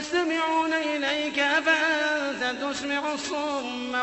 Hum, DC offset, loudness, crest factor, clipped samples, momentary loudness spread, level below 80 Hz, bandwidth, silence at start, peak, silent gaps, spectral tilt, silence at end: none; under 0.1%; -25 LUFS; 16 dB; under 0.1%; 7 LU; -64 dBFS; 8.4 kHz; 0 s; -8 dBFS; none; -1.5 dB/octave; 0 s